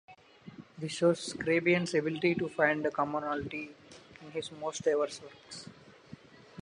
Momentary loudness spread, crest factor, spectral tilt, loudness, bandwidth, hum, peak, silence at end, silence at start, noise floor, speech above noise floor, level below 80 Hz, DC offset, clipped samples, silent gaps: 23 LU; 22 dB; -5 dB/octave; -31 LUFS; 11 kHz; none; -12 dBFS; 0 s; 0.1 s; -53 dBFS; 22 dB; -68 dBFS; under 0.1%; under 0.1%; none